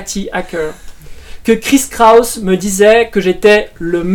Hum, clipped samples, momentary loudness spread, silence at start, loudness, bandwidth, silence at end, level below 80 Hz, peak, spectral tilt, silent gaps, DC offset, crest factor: none; 1%; 13 LU; 0 s; -11 LUFS; 18.5 kHz; 0 s; -34 dBFS; 0 dBFS; -4 dB/octave; none; under 0.1%; 12 dB